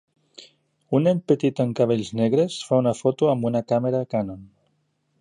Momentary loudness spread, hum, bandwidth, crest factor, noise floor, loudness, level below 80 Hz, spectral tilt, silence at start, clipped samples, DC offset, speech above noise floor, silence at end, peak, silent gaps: 5 LU; none; 11 kHz; 16 dB; -70 dBFS; -22 LUFS; -62 dBFS; -7.5 dB/octave; 0.4 s; under 0.1%; under 0.1%; 48 dB; 0.75 s; -6 dBFS; none